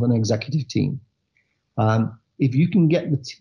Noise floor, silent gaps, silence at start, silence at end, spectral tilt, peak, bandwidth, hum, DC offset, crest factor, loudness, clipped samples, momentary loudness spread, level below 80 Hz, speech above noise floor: -69 dBFS; none; 0 s; 0.05 s; -7.5 dB/octave; -8 dBFS; 7.2 kHz; none; under 0.1%; 12 dB; -21 LUFS; under 0.1%; 9 LU; -60 dBFS; 49 dB